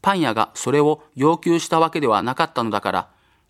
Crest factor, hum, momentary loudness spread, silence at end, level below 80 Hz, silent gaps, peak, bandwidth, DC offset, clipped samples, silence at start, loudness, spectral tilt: 18 dB; none; 5 LU; 0.45 s; -62 dBFS; none; -2 dBFS; 14.5 kHz; under 0.1%; under 0.1%; 0.05 s; -20 LUFS; -5 dB/octave